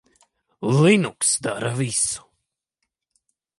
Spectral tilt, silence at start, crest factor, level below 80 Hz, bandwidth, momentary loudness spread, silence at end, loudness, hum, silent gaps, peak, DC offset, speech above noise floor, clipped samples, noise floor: -4.5 dB/octave; 0.6 s; 18 dB; -62 dBFS; 11.5 kHz; 10 LU; 1.4 s; -20 LUFS; none; none; -4 dBFS; under 0.1%; 59 dB; under 0.1%; -79 dBFS